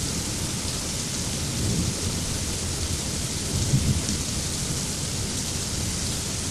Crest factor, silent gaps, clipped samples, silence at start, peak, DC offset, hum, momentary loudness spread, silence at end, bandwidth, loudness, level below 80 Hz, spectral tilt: 16 dB; none; under 0.1%; 0 s; -10 dBFS; under 0.1%; none; 3 LU; 0 s; 14.5 kHz; -26 LUFS; -36 dBFS; -3.5 dB/octave